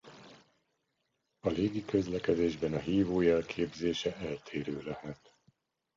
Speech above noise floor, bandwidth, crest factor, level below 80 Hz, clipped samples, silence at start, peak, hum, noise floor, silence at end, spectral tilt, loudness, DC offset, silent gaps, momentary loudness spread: 49 dB; 7.6 kHz; 18 dB; -58 dBFS; under 0.1%; 0.05 s; -14 dBFS; none; -81 dBFS; 0.85 s; -6.5 dB/octave; -33 LUFS; under 0.1%; none; 13 LU